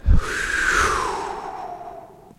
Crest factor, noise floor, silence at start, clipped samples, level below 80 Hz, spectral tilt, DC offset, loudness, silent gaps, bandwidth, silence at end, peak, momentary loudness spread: 18 dB; -41 dBFS; 0.05 s; under 0.1%; -26 dBFS; -3.5 dB/octave; under 0.1%; -22 LUFS; none; 14 kHz; 0.25 s; -4 dBFS; 18 LU